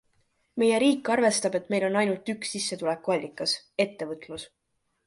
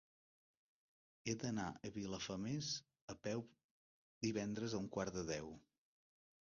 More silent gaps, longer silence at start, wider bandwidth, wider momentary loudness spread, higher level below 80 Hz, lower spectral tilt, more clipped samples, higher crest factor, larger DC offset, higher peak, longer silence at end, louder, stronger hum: second, none vs 3.01-3.08 s, 3.64-4.21 s; second, 0.55 s vs 1.25 s; first, 11.5 kHz vs 7.2 kHz; first, 15 LU vs 8 LU; about the same, -70 dBFS vs -70 dBFS; second, -3.5 dB/octave vs -5 dB/octave; neither; about the same, 16 dB vs 20 dB; neither; first, -10 dBFS vs -28 dBFS; second, 0.6 s vs 0.9 s; first, -26 LUFS vs -45 LUFS; neither